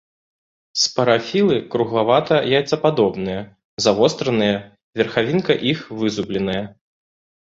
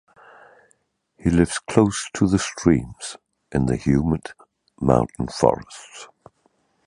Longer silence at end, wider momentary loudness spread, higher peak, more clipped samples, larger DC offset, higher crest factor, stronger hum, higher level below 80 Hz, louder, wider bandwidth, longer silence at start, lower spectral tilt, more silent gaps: about the same, 0.75 s vs 0.8 s; second, 10 LU vs 19 LU; about the same, -2 dBFS vs 0 dBFS; neither; neither; about the same, 18 dB vs 22 dB; neither; second, -54 dBFS vs -40 dBFS; about the same, -19 LUFS vs -21 LUFS; second, 8 kHz vs 11.5 kHz; second, 0.75 s vs 1.25 s; second, -4.5 dB/octave vs -6 dB/octave; first, 3.64-3.77 s, 4.83-4.93 s vs none